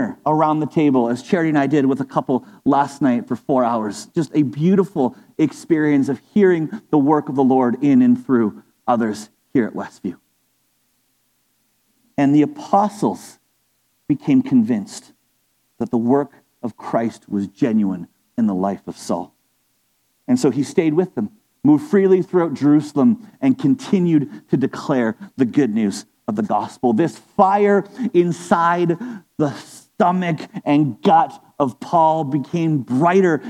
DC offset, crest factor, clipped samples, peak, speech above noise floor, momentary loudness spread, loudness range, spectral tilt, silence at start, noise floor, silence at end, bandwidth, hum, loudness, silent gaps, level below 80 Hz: under 0.1%; 18 dB; under 0.1%; 0 dBFS; 48 dB; 10 LU; 6 LU; -7.5 dB/octave; 0 s; -65 dBFS; 0 s; 12.5 kHz; none; -18 LUFS; none; -66 dBFS